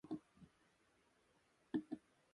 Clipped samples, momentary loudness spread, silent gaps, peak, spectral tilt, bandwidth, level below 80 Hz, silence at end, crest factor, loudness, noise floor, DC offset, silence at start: under 0.1%; 22 LU; none; -30 dBFS; -7.5 dB/octave; 11 kHz; -84 dBFS; 0.35 s; 24 dB; -49 LUFS; -77 dBFS; under 0.1%; 0.05 s